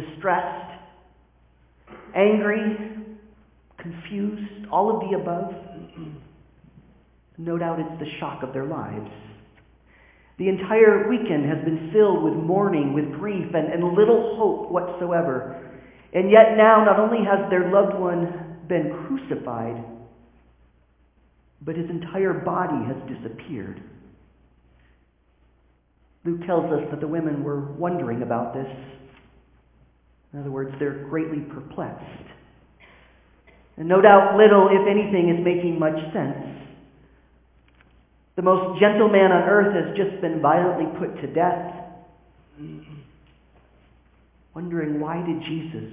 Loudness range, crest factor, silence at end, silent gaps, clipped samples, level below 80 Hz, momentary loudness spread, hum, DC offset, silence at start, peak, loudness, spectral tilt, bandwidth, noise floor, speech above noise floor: 14 LU; 22 dB; 0 s; none; under 0.1%; -58 dBFS; 21 LU; none; under 0.1%; 0 s; 0 dBFS; -21 LUFS; -10.5 dB/octave; 3.7 kHz; -61 dBFS; 41 dB